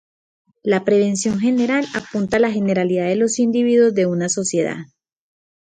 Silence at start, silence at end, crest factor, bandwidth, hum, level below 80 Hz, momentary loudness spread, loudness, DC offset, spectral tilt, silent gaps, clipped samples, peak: 0.65 s; 0.95 s; 14 dB; 9.6 kHz; none; -58 dBFS; 8 LU; -18 LUFS; under 0.1%; -5 dB/octave; none; under 0.1%; -4 dBFS